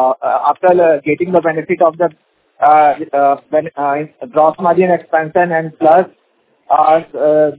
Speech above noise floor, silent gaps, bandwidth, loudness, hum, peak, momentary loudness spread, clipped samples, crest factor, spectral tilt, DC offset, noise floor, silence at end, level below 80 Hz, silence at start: 45 dB; none; 4 kHz; -13 LUFS; none; 0 dBFS; 7 LU; under 0.1%; 12 dB; -10.5 dB/octave; under 0.1%; -57 dBFS; 0.05 s; -60 dBFS; 0 s